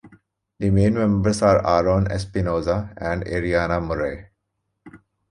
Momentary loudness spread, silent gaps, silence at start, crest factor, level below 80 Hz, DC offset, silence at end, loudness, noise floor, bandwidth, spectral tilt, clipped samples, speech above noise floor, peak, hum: 9 LU; none; 0.05 s; 18 dB; -38 dBFS; under 0.1%; 0.35 s; -21 LUFS; -76 dBFS; 11 kHz; -7 dB/octave; under 0.1%; 56 dB; -4 dBFS; none